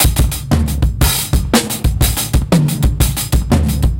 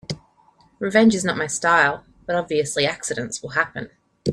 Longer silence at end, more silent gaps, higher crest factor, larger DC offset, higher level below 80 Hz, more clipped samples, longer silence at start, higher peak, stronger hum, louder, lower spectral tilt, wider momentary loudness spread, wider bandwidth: about the same, 0 s vs 0 s; neither; second, 14 dB vs 20 dB; first, 0.3% vs under 0.1%; first, -18 dBFS vs -56 dBFS; neither; about the same, 0 s vs 0.1 s; about the same, 0 dBFS vs -2 dBFS; neither; first, -15 LUFS vs -21 LUFS; about the same, -4.5 dB/octave vs -4 dB/octave; second, 3 LU vs 17 LU; first, 17.5 kHz vs 13 kHz